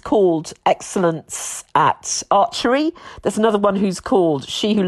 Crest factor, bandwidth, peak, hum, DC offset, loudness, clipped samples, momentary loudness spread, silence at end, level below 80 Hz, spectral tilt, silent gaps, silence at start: 16 dB; 13 kHz; -2 dBFS; none; under 0.1%; -19 LUFS; under 0.1%; 8 LU; 0 s; -52 dBFS; -4.5 dB/octave; none; 0.05 s